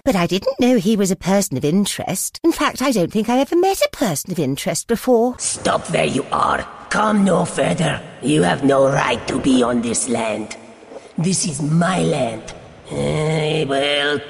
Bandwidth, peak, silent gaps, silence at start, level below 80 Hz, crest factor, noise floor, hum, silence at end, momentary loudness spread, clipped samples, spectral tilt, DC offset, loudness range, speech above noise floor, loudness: 15.5 kHz; -2 dBFS; none; 0.05 s; -48 dBFS; 16 dB; -39 dBFS; none; 0 s; 8 LU; under 0.1%; -4.5 dB/octave; under 0.1%; 3 LU; 21 dB; -18 LUFS